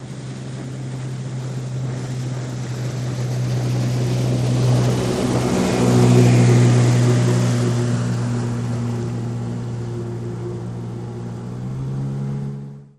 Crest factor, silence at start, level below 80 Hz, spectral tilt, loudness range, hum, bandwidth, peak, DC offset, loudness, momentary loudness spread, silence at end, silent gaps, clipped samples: 18 dB; 0 s; -44 dBFS; -7 dB/octave; 11 LU; none; 12 kHz; 0 dBFS; under 0.1%; -20 LUFS; 16 LU; 0.1 s; none; under 0.1%